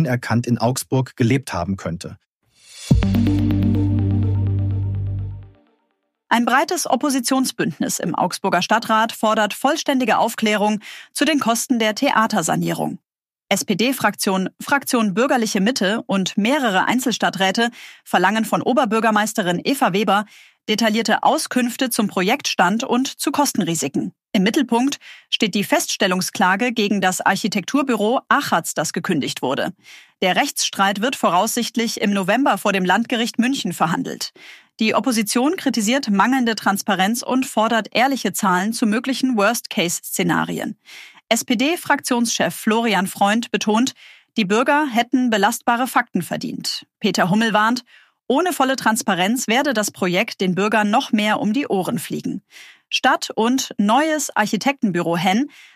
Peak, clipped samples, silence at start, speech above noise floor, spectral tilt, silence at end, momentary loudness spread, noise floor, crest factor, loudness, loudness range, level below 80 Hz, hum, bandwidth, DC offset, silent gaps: -2 dBFS; under 0.1%; 0 s; 52 dB; -4 dB/octave; 0.3 s; 6 LU; -71 dBFS; 18 dB; -19 LUFS; 2 LU; -44 dBFS; none; 15.5 kHz; under 0.1%; 2.26-2.41 s